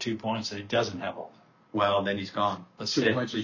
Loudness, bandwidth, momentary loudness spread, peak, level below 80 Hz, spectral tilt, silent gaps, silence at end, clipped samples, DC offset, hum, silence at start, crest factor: -29 LUFS; 7.6 kHz; 10 LU; -12 dBFS; -62 dBFS; -4.5 dB/octave; none; 0 s; under 0.1%; under 0.1%; none; 0 s; 18 dB